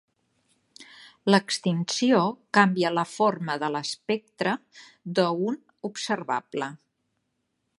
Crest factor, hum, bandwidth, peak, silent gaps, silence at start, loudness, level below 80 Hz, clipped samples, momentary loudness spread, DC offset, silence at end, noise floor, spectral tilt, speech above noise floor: 24 dB; none; 11.5 kHz; -4 dBFS; none; 0.8 s; -26 LUFS; -76 dBFS; under 0.1%; 12 LU; under 0.1%; 1.05 s; -77 dBFS; -5 dB/octave; 52 dB